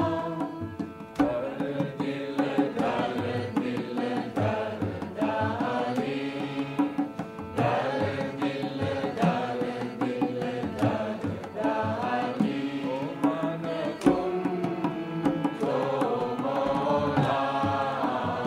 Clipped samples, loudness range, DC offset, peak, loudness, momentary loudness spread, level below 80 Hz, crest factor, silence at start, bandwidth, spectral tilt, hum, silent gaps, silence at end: under 0.1%; 2 LU; under 0.1%; -8 dBFS; -29 LUFS; 6 LU; -60 dBFS; 22 dB; 0 s; 12.5 kHz; -7 dB/octave; none; none; 0 s